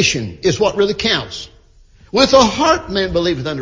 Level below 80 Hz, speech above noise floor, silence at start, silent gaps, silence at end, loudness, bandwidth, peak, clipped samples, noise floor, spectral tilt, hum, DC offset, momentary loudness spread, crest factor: -38 dBFS; 31 dB; 0 s; none; 0 s; -15 LUFS; 7.6 kHz; 0 dBFS; under 0.1%; -47 dBFS; -4 dB/octave; none; under 0.1%; 11 LU; 16 dB